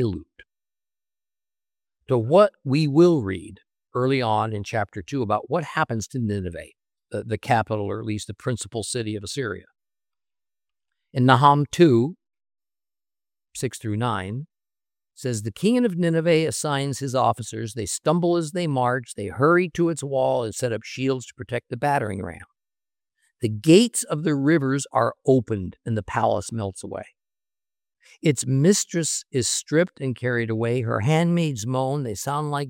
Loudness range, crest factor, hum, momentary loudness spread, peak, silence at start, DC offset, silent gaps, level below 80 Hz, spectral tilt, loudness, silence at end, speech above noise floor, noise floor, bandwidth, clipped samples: 6 LU; 22 dB; none; 13 LU; -2 dBFS; 0 s; under 0.1%; none; -60 dBFS; -5.5 dB/octave; -23 LUFS; 0 s; over 68 dB; under -90 dBFS; 16.5 kHz; under 0.1%